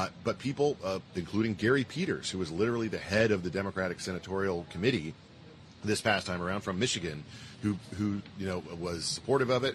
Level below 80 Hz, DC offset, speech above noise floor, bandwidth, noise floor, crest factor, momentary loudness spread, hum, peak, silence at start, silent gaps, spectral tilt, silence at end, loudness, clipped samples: -60 dBFS; under 0.1%; 21 dB; 13 kHz; -52 dBFS; 20 dB; 9 LU; none; -12 dBFS; 0 s; none; -5 dB/octave; 0 s; -32 LUFS; under 0.1%